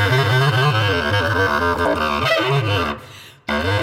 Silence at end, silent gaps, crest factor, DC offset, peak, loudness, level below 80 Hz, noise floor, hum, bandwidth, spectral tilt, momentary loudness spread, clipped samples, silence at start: 0 s; none; 14 dB; under 0.1%; -4 dBFS; -18 LUFS; -44 dBFS; -40 dBFS; none; 16.5 kHz; -5.5 dB/octave; 8 LU; under 0.1%; 0 s